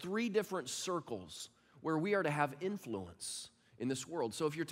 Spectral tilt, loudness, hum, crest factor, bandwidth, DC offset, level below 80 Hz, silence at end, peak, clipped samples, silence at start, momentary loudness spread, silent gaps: -4.5 dB/octave; -39 LUFS; none; 20 dB; 16 kHz; under 0.1%; -76 dBFS; 0 s; -18 dBFS; under 0.1%; 0 s; 12 LU; none